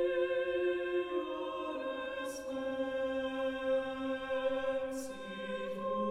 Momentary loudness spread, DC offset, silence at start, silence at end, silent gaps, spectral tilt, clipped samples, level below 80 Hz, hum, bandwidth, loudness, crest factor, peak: 7 LU; under 0.1%; 0 s; 0 s; none; -4.5 dB/octave; under 0.1%; -66 dBFS; none; 14 kHz; -36 LUFS; 12 dB; -22 dBFS